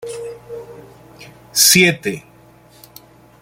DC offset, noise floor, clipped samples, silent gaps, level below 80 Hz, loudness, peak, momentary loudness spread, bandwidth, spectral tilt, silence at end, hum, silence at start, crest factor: under 0.1%; -47 dBFS; under 0.1%; none; -58 dBFS; -12 LUFS; 0 dBFS; 25 LU; 17 kHz; -2 dB/octave; 1.2 s; none; 0 s; 20 dB